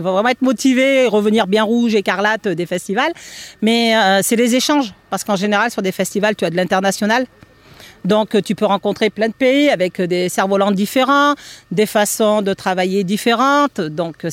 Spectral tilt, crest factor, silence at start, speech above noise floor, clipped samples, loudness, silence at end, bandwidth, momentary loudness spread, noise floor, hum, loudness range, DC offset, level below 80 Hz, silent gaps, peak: -4 dB/octave; 14 dB; 0 s; 27 dB; under 0.1%; -16 LUFS; 0 s; 16.5 kHz; 7 LU; -42 dBFS; none; 2 LU; under 0.1%; -58 dBFS; none; -2 dBFS